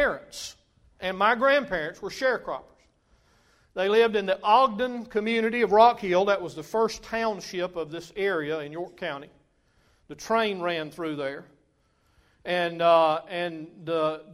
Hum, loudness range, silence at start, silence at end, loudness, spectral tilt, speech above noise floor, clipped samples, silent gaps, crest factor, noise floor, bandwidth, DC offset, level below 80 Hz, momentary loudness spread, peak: none; 9 LU; 0 s; 0 s; -25 LUFS; -4.5 dB/octave; 42 dB; under 0.1%; none; 22 dB; -67 dBFS; 15 kHz; under 0.1%; -60 dBFS; 16 LU; -6 dBFS